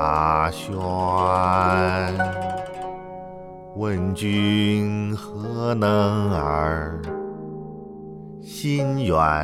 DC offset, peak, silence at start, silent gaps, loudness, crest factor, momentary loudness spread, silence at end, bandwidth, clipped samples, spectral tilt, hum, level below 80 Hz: under 0.1%; -6 dBFS; 0 s; none; -22 LUFS; 16 dB; 18 LU; 0 s; 15 kHz; under 0.1%; -6.5 dB/octave; none; -42 dBFS